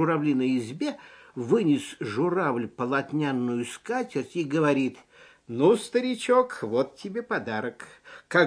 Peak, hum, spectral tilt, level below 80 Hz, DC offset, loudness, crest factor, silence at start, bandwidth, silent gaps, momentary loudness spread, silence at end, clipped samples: -8 dBFS; none; -6 dB/octave; -74 dBFS; under 0.1%; -27 LUFS; 20 dB; 0 s; 10.5 kHz; none; 11 LU; 0 s; under 0.1%